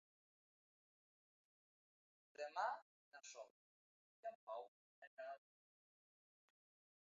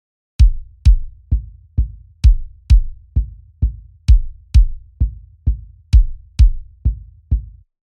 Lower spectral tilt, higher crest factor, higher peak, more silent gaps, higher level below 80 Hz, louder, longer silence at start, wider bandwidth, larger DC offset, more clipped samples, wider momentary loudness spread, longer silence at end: second, 3 dB/octave vs -7 dB/octave; first, 26 dB vs 14 dB; second, -32 dBFS vs -2 dBFS; first, 2.82-3.12 s, 3.50-4.23 s, 4.35-4.47 s, 4.68-5.17 s vs none; second, under -90 dBFS vs -16 dBFS; second, -52 LUFS vs -19 LUFS; first, 2.4 s vs 0.4 s; about the same, 7.2 kHz vs 6.8 kHz; neither; neither; first, 19 LU vs 8 LU; first, 1.65 s vs 0.4 s